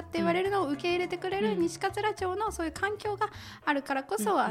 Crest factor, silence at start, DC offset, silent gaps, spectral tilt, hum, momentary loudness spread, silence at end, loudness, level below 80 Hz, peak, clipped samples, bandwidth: 16 dB; 0 s; under 0.1%; none; -4.5 dB/octave; none; 5 LU; 0 s; -30 LUFS; -56 dBFS; -14 dBFS; under 0.1%; 16 kHz